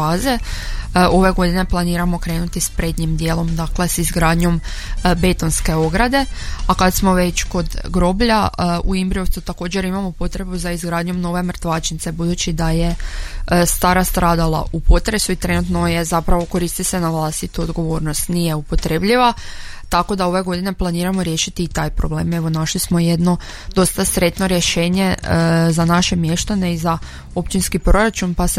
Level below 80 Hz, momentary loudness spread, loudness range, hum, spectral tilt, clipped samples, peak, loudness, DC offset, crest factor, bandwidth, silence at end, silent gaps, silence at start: -24 dBFS; 8 LU; 4 LU; none; -5 dB/octave; under 0.1%; -2 dBFS; -18 LUFS; under 0.1%; 16 dB; 16 kHz; 0 s; none; 0 s